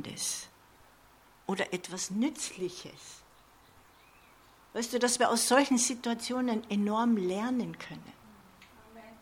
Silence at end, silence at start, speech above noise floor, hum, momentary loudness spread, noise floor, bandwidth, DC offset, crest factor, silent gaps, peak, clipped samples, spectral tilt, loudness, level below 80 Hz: 0.05 s; 0 s; 29 dB; none; 20 LU; -60 dBFS; 16.5 kHz; under 0.1%; 24 dB; none; -10 dBFS; under 0.1%; -3 dB/octave; -30 LUFS; -70 dBFS